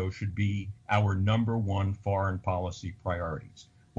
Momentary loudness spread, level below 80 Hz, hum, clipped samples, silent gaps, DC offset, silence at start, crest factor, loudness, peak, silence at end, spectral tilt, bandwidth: 10 LU; -52 dBFS; none; under 0.1%; none; under 0.1%; 0 s; 16 dB; -30 LUFS; -14 dBFS; 0.35 s; -7.5 dB/octave; 7.4 kHz